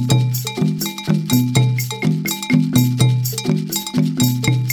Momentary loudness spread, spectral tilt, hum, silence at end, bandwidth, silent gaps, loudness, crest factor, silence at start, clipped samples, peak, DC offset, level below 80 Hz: 5 LU; -5 dB/octave; none; 0 s; over 20 kHz; none; -18 LUFS; 16 dB; 0 s; under 0.1%; 0 dBFS; under 0.1%; -50 dBFS